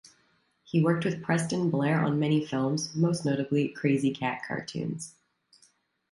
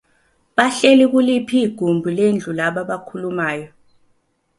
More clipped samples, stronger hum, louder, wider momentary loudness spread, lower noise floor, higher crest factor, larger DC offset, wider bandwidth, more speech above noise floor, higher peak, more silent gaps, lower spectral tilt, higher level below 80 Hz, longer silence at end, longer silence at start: neither; neither; second, -28 LUFS vs -17 LUFS; second, 8 LU vs 13 LU; first, -69 dBFS vs -63 dBFS; about the same, 16 dB vs 18 dB; neither; about the same, 11.5 kHz vs 11.5 kHz; second, 42 dB vs 46 dB; second, -12 dBFS vs 0 dBFS; neither; about the same, -6 dB/octave vs -5 dB/octave; second, -68 dBFS vs -62 dBFS; about the same, 1 s vs 0.9 s; first, 0.7 s vs 0.55 s